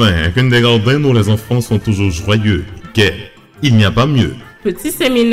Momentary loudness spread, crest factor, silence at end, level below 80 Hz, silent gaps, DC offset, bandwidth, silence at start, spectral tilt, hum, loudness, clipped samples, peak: 9 LU; 10 dB; 0 s; -32 dBFS; none; under 0.1%; 15.5 kHz; 0 s; -6 dB/octave; none; -13 LUFS; under 0.1%; -2 dBFS